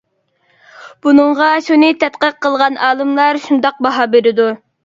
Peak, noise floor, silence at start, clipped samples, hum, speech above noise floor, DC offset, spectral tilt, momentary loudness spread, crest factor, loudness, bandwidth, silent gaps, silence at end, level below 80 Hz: 0 dBFS; -60 dBFS; 0.8 s; under 0.1%; none; 49 dB; under 0.1%; -4.5 dB/octave; 5 LU; 14 dB; -12 LUFS; 7.6 kHz; none; 0.3 s; -62 dBFS